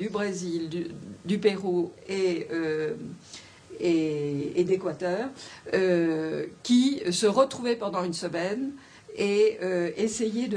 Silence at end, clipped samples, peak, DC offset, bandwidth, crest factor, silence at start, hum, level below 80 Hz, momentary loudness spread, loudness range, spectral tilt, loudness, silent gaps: 0 s; under 0.1%; -8 dBFS; under 0.1%; 10.5 kHz; 20 dB; 0 s; none; -68 dBFS; 14 LU; 4 LU; -5 dB/octave; -27 LUFS; none